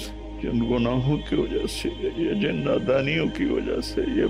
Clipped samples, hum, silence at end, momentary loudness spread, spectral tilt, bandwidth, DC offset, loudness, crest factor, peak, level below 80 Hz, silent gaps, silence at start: under 0.1%; none; 0 s; 6 LU; -6.5 dB/octave; 15.5 kHz; under 0.1%; -25 LUFS; 14 dB; -12 dBFS; -38 dBFS; none; 0 s